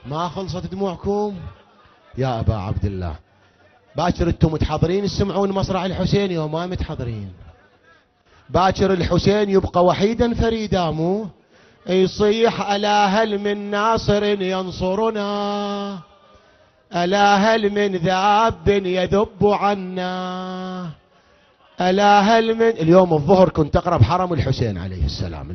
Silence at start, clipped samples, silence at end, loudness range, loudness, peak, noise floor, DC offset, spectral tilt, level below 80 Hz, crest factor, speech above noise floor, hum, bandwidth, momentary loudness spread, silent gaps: 0.05 s; under 0.1%; 0 s; 7 LU; -19 LUFS; 0 dBFS; -55 dBFS; under 0.1%; -6.5 dB/octave; -36 dBFS; 18 dB; 36 dB; none; 6.6 kHz; 13 LU; none